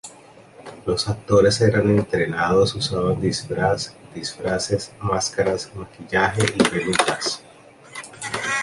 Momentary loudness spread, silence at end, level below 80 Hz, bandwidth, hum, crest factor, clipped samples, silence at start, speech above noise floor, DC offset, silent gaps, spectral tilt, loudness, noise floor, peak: 15 LU; 0 s; -46 dBFS; 11.5 kHz; none; 20 dB; under 0.1%; 0.05 s; 26 dB; under 0.1%; none; -4.5 dB/octave; -21 LUFS; -47 dBFS; -2 dBFS